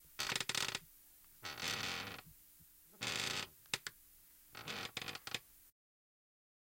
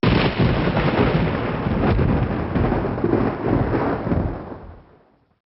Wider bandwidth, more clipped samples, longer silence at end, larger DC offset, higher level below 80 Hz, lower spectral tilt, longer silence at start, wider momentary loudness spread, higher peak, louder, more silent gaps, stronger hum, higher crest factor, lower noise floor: first, 17 kHz vs 5.8 kHz; neither; first, 1 s vs 0.7 s; neither; second, -72 dBFS vs -32 dBFS; second, -1 dB/octave vs -6.5 dB/octave; about the same, 0 s vs 0.05 s; first, 23 LU vs 5 LU; second, -18 dBFS vs -4 dBFS; second, -42 LUFS vs -21 LUFS; neither; neither; first, 28 dB vs 16 dB; first, -64 dBFS vs -55 dBFS